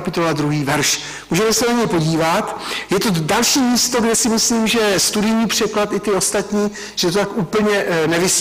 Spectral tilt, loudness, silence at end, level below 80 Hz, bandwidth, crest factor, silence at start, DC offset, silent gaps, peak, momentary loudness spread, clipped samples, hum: -3.5 dB/octave; -16 LUFS; 0 s; -46 dBFS; 16 kHz; 10 dB; 0 s; under 0.1%; none; -8 dBFS; 6 LU; under 0.1%; none